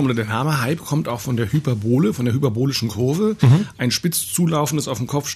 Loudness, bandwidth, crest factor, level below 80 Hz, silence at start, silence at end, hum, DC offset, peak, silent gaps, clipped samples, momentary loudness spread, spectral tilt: -20 LUFS; 14 kHz; 16 dB; -54 dBFS; 0 s; 0 s; none; under 0.1%; -4 dBFS; none; under 0.1%; 7 LU; -5.5 dB/octave